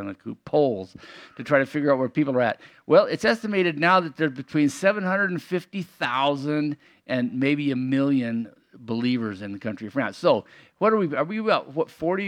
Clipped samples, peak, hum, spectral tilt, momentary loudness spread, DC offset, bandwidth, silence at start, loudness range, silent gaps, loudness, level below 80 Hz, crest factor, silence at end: under 0.1%; -4 dBFS; none; -6.5 dB/octave; 13 LU; under 0.1%; 13 kHz; 0 s; 4 LU; none; -24 LUFS; -70 dBFS; 20 dB; 0 s